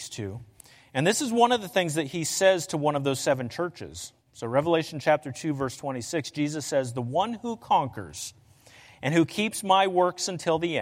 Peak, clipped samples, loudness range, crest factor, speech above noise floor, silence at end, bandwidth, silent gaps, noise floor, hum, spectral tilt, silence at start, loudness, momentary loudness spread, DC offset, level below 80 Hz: -8 dBFS; under 0.1%; 4 LU; 20 dB; 28 dB; 0 s; 16.5 kHz; none; -54 dBFS; none; -4.5 dB/octave; 0 s; -26 LUFS; 14 LU; under 0.1%; -64 dBFS